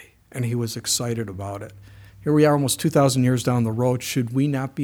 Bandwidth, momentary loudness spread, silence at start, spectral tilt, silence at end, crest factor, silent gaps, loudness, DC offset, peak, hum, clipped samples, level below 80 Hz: 18.5 kHz; 14 LU; 0 s; -5.5 dB/octave; 0 s; 16 dB; none; -22 LUFS; under 0.1%; -6 dBFS; none; under 0.1%; -56 dBFS